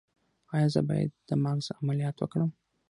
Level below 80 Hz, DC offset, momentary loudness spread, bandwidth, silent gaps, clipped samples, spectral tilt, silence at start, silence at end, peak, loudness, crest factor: -66 dBFS; under 0.1%; 5 LU; 11 kHz; none; under 0.1%; -7.5 dB/octave; 0.5 s; 0.4 s; -10 dBFS; -30 LUFS; 20 dB